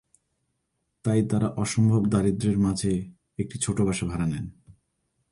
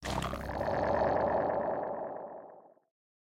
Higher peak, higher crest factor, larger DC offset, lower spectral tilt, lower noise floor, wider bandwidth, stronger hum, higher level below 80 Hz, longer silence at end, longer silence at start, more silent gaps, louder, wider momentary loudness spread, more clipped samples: first, -10 dBFS vs -18 dBFS; about the same, 16 dB vs 16 dB; neither; about the same, -6.5 dB/octave vs -6 dB/octave; first, -77 dBFS vs -55 dBFS; second, 11.5 kHz vs 16.5 kHz; neither; about the same, -48 dBFS vs -50 dBFS; about the same, 0.6 s vs 0.55 s; first, 1.05 s vs 0 s; neither; first, -25 LUFS vs -33 LUFS; second, 12 LU vs 16 LU; neither